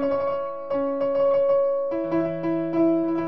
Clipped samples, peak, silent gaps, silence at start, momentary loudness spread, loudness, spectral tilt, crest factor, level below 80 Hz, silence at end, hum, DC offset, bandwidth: under 0.1%; -12 dBFS; none; 0 s; 6 LU; -23 LUFS; -10 dB/octave; 12 dB; -58 dBFS; 0 s; none; 0.6%; 5.6 kHz